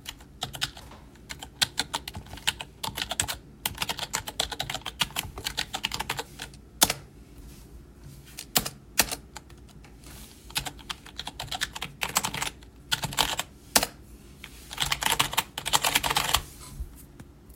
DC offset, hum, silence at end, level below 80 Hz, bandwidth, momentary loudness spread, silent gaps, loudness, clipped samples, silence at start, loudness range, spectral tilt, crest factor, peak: under 0.1%; none; 0 s; -48 dBFS; 17 kHz; 22 LU; none; -28 LUFS; under 0.1%; 0 s; 6 LU; -1 dB/octave; 30 dB; -2 dBFS